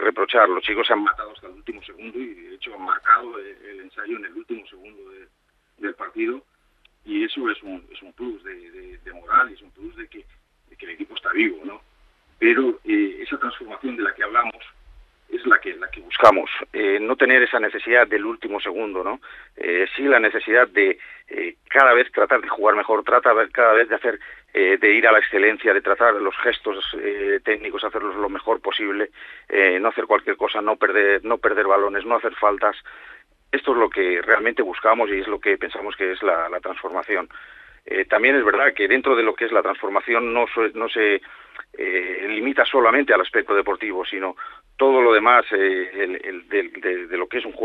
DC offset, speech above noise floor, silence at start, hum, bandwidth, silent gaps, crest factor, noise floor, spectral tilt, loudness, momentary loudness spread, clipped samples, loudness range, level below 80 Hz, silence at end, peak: under 0.1%; 40 dB; 0 s; none; 6.4 kHz; none; 20 dB; -61 dBFS; -4.5 dB/octave; -19 LUFS; 19 LU; under 0.1%; 10 LU; -56 dBFS; 0 s; 0 dBFS